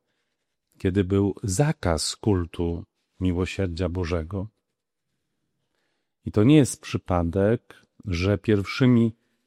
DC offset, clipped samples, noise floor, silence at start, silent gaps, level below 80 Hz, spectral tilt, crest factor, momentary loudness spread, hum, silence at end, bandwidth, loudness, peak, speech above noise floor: under 0.1%; under 0.1%; -82 dBFS; 0.85 s; none; -44 dBFS; -6 dB/octave; 20 dB; 12 LU; none; 0.35 s; 13.5 kHz; -24 LUFS; -6 dBFS; 59 dB